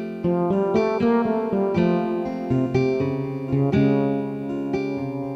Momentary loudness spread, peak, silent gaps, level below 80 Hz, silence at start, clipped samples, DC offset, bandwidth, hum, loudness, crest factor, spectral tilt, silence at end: 7 LU; -8 dBFS; none; -50 dBFS; 0 s; under 0.1%; under 0.1%; 7.6 kHz; none; -22 LUFS; 14 dB; -9 dB/octave; 0 s